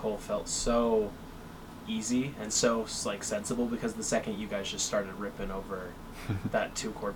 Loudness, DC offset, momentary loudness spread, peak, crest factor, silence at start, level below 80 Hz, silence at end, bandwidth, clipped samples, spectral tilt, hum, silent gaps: -32 LUFS; under 0.1%; 14 LU; -14 dBFS; 18 dB; 0 s; -48 dBFS; 0 s; 19 kHz; under 0.1%; -3.5 dB/octave; none; none